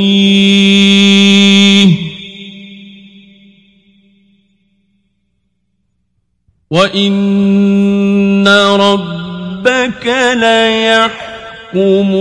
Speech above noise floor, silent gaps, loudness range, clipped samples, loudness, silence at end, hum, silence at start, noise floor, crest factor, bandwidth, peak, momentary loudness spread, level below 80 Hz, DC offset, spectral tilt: 55 dB; none; 9 LU; 0.1%; -9 LUFS; 0 s; none; 0 s; -64 dBFS; 10 dB; 11 kHz; 0 dBFS; 17 LU; -50 dBFS; under 0.1%; -5 dB/octave